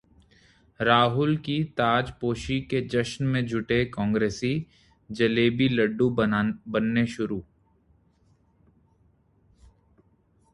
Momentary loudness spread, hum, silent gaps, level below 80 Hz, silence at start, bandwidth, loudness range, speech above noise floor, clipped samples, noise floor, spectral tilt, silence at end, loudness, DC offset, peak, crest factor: 8 LU; none; none; -52 dBFS; 0.8 s; 11.5 kHz; 7 LU; 39 dB; under 0.1%; -64 dBFS; -6.5 dB/octave; 3.1 s; -25 LUFS; under 0.1%; -4 dBFS; 22 dB